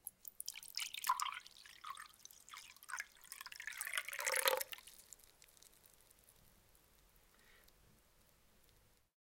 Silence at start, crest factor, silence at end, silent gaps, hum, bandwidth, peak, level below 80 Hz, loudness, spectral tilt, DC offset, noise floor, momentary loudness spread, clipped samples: 0.05 s; 34 dB; 1.6 s; none; none; 17 kHz; -12 dBFS; -78 dBFS; -43 LUFS; 1.5 dB/octave; under 0.1%; -72 dBFS; 23 LU; under 0.1%